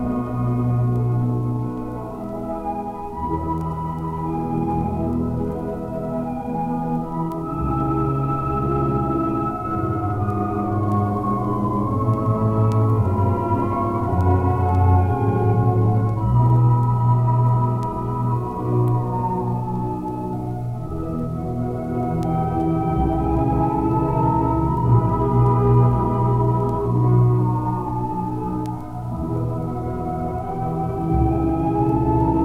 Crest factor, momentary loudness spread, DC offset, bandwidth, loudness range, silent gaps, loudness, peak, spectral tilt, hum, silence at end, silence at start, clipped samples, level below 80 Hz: 14 dB; 9 LU; under 0.1%; 3.4 kHz; 7 LU; none; -21 LUFS; -6 dBFS; -11 dB/octave; none; 0 s; 0 s; under 0.1%; -34 dBFS